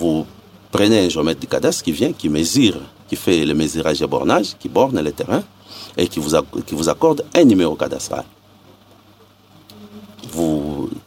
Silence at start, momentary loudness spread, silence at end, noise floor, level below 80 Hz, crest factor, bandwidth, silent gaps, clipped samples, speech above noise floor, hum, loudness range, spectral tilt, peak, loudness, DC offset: 0 s; 13 LU; 0.1 s; -49 dBFS; -46 dBFS; 18 dB; 16.5 kHz; none; under 0.1%; 32 dB; none; 3 LU; -5 dB/octave; 0 dBFS; -18 LUFS; under 0.1%